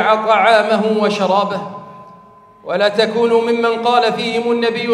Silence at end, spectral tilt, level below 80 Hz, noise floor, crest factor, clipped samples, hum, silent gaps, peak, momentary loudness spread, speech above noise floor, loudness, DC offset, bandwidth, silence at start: 0 s; -5 dB/octave; -66 dBFS; -44 dBFS; 14 dB; under 0.1%; none; none; 0 dBFS; 11 LU; 29 dB; -15 LUFS; under 0.1%; 11 kHz; 0 s